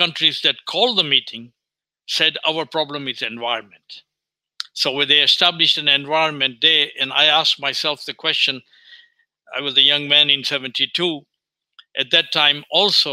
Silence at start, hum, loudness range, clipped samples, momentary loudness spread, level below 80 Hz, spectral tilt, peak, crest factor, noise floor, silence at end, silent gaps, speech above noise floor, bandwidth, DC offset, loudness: 0 s; none; 7 LU; under 0.1%; 12 LU; -74 dBFS; -2 dB/octave; 0 dBFS; 20 dB; -86 dBFS; 0 s; none; 67 dB; 16 kHz; under 0.1%; -16 LUFS